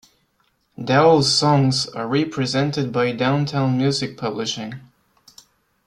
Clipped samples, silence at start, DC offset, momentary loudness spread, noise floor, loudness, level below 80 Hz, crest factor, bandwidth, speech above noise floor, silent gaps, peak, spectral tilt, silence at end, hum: under 0.1%; 0.8 s; under 0.1%; 11 LU; -66 dBFS; -19 LUFS; -58 dBFS; 18 dB; 11.5 kHz; 47 dB; none; -2 dBFS; -5 dB/octave; 1.05 s; none